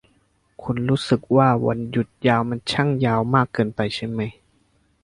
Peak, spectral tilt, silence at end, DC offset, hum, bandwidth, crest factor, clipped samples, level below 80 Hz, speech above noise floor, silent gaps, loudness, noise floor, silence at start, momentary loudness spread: -2 dBFS; -7 dB/octave; 0.75 s; under 0.1%; none; 11 kHz; 20 dB; under 0.1%; -52 dBFS; 42 dB; none; -21 LUFS; -63 dBFS; 0.6 s; 10 LU